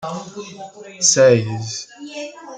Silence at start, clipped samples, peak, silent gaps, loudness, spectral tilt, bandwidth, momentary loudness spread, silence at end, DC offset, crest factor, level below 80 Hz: 0 s; under 0.1%; 0 dBFS; none; -15 LUFS; -3 dB/octave; 9.6 kHz; 22 LU; 0 s; under 0.1%; 18 dB; -62 dBFS